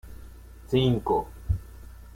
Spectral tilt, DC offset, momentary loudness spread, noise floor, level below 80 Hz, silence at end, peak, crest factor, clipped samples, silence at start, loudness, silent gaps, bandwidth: -7.5 dB/octave; under 0.1%; 24 LU; -45 dBFS; -40 dBFS; 0.05 s; -10 dBFS; 18 dB; under 0.1%; 0.05 s; -27 LUFS; none; 16.5 kHz